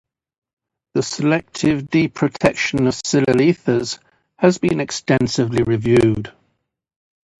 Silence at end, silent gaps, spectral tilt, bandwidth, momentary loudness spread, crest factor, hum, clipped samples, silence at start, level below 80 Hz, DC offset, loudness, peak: 1.1 s; none; -5.5 dB/octave; 11.5 kHz; 8 LU; 18 dB; none; under 0.1%; 0.95 s; -46 dBFS; under 0.1%; -18 LUFS; 0 dBFS